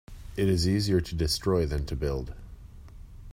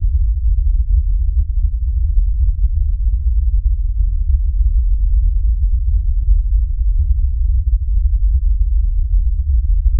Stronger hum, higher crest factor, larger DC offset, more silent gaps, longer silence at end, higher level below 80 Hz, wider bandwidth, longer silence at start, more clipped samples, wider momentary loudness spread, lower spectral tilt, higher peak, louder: neither; first, 16 dB vs 10 dB; neither; neither; about the same, 0 s vs 0 s; second, -38 dBFS vs -14 dBFS; first, 16 kHz vs 0.3 kHz; about the same, 0.1 s vs 0 s; neither; first, 16 LU vs 2 LU; second, -6 dB/octave vs -17 dB/octave; second, -12 dBFS vs -2 dBFS; second, -28 LUFS vs -18 LUFS